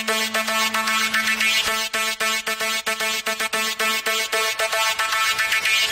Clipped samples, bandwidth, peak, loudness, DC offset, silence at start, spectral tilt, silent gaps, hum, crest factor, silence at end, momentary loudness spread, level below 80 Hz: under 0.1%; 16.5 kHz; -6 dBFS; -20 LUFS; under 0.1%; 0 s; 0.5 dB/octave; none; none; 16 dB; 0 s; 4 LU; -58 dBFS